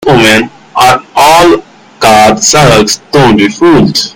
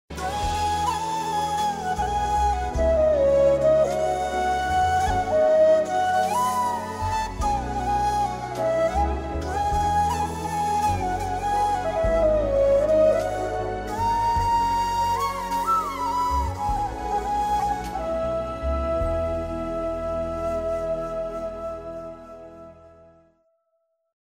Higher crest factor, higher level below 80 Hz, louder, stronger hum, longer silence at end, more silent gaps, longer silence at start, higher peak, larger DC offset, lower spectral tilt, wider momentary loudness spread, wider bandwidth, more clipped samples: second, 6 dB vs 14 dB; about the same, -32 dBFS vs -36 dBFS; first, -5 LUFS vs -24 LUFS; neither; second, 0.05 s vs 1.35 s; neither; about the same, 0 s vs 0.1 s; first, 0 dBFS vs -10 dBFS; neither; second, -4 dB/octave vs -5.5 dB/octave; second, 5 LU vs 9 LU; first, over 20 kHz vs 16 kHz; first, 6% vs under 0.1%